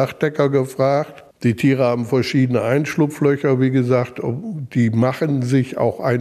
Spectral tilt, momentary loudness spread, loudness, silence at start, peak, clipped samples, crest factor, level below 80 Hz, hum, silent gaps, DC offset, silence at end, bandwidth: -7.5 dB/octave; 6 LU; -18 LUFS; 0 s; -4 dBFS; under 0.1%; 14 dB; -60 dBFS; none; none; under 0.1%; 0 s; 14 kHz